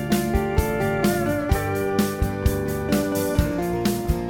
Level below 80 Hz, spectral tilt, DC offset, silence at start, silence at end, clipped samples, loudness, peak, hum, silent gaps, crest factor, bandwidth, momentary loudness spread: -30 dBFS; -6 dB/octave; under 0.1%; 0 s; 0 s; under 0.1%; -23 LUFS; -6 dBFS; none; none; 16 dB; 17.5 kHz; 2 LU